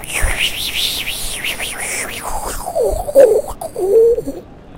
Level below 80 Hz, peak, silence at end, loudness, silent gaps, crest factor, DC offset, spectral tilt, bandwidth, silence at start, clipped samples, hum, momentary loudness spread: -28 dBFS; 0 dBFS; 0 s; -16 LUFS; none; 16 dB; under 0.1%; -2.5 dB/octave; 16.5 kHz; 0 s; 0.1%; none; 12 LU